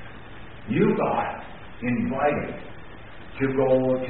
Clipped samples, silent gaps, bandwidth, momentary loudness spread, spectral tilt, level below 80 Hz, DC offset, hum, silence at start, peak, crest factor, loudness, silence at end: under 0.1%; none; 4 kHz; 22 LU; -6.5 dB/octave; -50 dBFS; 0.9%; none; 0 s; -8 dBFS; 18 dB; -25 LUFS; 0 s